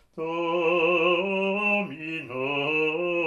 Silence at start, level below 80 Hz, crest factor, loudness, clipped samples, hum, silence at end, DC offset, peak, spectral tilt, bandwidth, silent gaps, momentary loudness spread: 0.15 s; -70 dBFS; 14 dB; -25 LUFS; under 0.1%; none; 0 s; under 0.1%; -12 dBFS; -6.5 dB/octave; 7.2 kHz; none; 10 LU